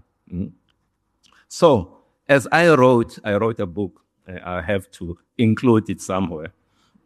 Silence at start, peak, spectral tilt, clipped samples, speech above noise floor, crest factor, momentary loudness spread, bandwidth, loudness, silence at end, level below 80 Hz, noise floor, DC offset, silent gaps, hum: 0.3 s; -2 dBFS; -6.5 dB/octave; under 0.1%; 51 dB; 20 dB; 20 LU; 13 kHz; -19 LUFS; 0.55 s; -50 dBFS; -70 dBFS; under 0.1%; none; none